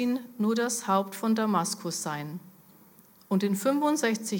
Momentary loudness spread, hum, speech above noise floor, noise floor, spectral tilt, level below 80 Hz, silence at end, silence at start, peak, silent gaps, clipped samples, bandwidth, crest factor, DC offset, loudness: 8 LU; none; 29 dB; -56 dBFS; -4.5 dB/octave; -82 dBFS; 0 s; 0 s; -12 dBFS; none; under 0.1%; 17.5 kHz; 16 dB; under 0.1%; -28 LUFS